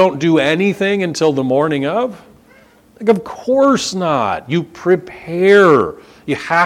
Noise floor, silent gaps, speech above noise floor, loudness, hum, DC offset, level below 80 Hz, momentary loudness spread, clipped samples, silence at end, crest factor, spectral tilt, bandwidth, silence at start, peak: -47 dBFS; none; 33 dB; -15 LUFS; none; under 0.1%; -54 dBFS; 11 LU; under 0.1%; 0 s; 14 dB; -5.5 dB/octave; 13.5 kHz; 0 s; 0 dBFS